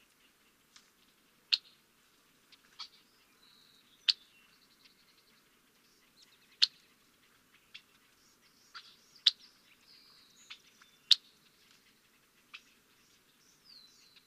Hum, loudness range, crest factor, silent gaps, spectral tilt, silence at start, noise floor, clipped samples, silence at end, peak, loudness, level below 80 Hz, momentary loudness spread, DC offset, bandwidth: none; 6 LU; 34 dB; none; 2.5 dB/octave; 1.5 s; -68 dBFS; under 0.1%; 3.1 s; -8 dBFS; -30 LUFS; -86 dBFS; 29 LU; under 0.1%; 15.5 kHz